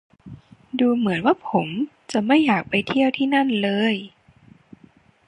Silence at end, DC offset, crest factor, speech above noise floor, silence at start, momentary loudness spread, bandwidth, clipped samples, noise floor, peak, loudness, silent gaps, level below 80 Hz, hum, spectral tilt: 1.2 s; under 0.1%; 18 dB; 34 dB; 0.25 s; 8 LU; 10.5 kHz; under 0.1%; -54 dBFS; -4 dBFS; -21 LUFS; none; -62 dBFS; none; -6 dB/octave